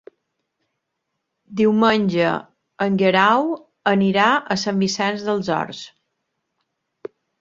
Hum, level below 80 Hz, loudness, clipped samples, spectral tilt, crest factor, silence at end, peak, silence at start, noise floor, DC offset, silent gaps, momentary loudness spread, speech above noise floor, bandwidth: none; -62 dBFS; -19 LUFS; under 0.1%; -5.5 dB/octave; 20 dB; 1.55 s; -2 dBFS; 1.5 s; -77 dBFS; under 0.1%; none; 20 LU; 59 dB; 7.6 kHz